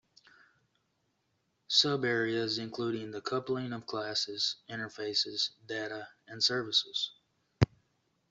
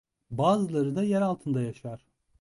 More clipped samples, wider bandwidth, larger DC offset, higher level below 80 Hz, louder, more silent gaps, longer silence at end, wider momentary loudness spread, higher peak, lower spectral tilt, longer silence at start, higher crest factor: neither; second, 8.2 kHz vs 11.5 kHz; neither; about the same, -62 dBFS vs -64 dBFS; second, -32 LUFS vs -27 LUFS; neither; first, 0.65 s vs 0.45 s; second, 11 LU vs 16 LU; about the same, -10 dBFS vs -10 dBFS; second, -4 dB/octave vs -7.5 dB/octave; first, 1.7 s vs 0.3 s; first, 26 dB vs 18 dB